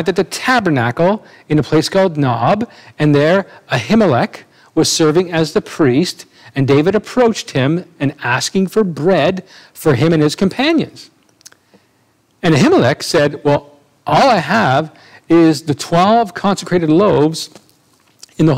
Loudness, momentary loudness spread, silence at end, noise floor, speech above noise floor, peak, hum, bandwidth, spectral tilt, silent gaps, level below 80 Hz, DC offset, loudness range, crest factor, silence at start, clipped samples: -14 LUFS; 8 LU; 0 s; -57 dBFS; 43 dB; 0 dBFS; none; 16 kHz; -5.5 dB/octave; none; -48 dBFS; 0.2%; 2 LU; 14 dB; 0 s; under 0.1%